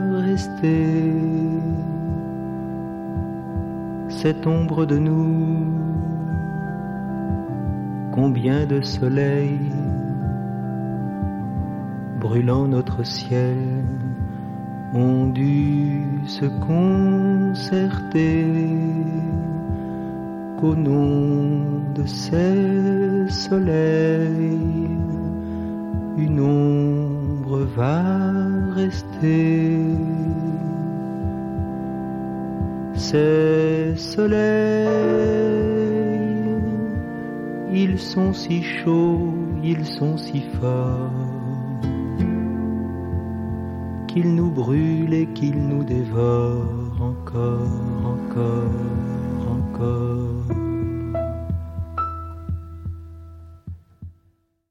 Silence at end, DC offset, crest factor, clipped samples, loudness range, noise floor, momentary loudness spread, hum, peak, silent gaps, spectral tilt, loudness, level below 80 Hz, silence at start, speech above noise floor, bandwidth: 0.6 s; under 0.1%; 14 dB; under 0.1%; 5 LU; -62 dBFS; 10 LU; none; -6 dBFS; none; -8.5 dB/octave; -22 LUFS; -40 dBFS; 0 s; 43 dB; 10 kHz